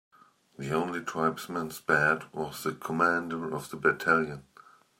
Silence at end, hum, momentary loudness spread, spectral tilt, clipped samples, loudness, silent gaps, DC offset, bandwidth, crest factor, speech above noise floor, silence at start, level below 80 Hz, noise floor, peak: 0.6 s; none; 11 LU; -5 dB/octave; under 0.1%; -29 LUFS; none; under 0.1%; 16 kHz; 22 dB; 28 dB; 0.6 s; -66 dBFS; -57 dBFS; -8 dBFS